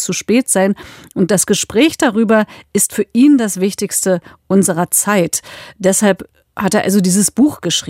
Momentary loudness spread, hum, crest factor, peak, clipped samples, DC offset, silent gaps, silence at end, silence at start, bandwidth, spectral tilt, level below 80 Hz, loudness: 8 LU; none; 14 dB; 0 dBFS; under 0.1%; under 0.1%; none; 0 s; 0 s; 16 kHz; -4 dB/octave; -54 dBFS; -14 LUFS